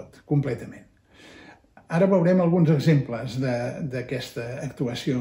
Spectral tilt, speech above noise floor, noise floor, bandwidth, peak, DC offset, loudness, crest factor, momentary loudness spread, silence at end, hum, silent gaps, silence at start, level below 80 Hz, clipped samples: -8 dB/octave; 27 dB; -50 dBFS; 16 kHz; -8 dBFS; under 0.1%; -24 LUFS; 16 dB; 13 LU; 0 s; none; none; 0 s; -58 dBFS; under 0.1%